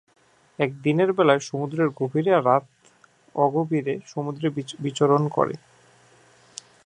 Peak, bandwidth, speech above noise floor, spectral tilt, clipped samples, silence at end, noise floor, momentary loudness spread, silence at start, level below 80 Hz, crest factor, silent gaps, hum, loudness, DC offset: -2 dBFS; 10.5 kHz; 35 dB; -6.5 dB/octave; under 0.1%; 1.3 s; -58 dBFS; 12 LU; 0.6 s; -72 dBFS; 22 dB; none; none; -23 LUFS; under 0.1%